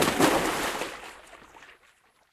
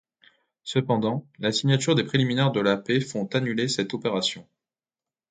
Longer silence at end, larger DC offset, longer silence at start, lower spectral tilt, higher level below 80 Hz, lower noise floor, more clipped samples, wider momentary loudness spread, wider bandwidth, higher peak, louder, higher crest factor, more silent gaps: second, 0.7 s vs 0.9 s; neither; second, 0 s vs 0.65 s; second, -3 dB/octave vs -5 dB/octave; first, -54 dBFS vs -64 dBFS; second, -62 dBFS vs under -90 dBFS; neither; first, 26 LU vs 6 LU; first, 16 kHz vs 9.4 kHz; about the same, -6 dBFS vs -6 dBFS; about the same, -26 LUFS vs -25 LUFS; about the same, 22 dB vs 20 dB; neither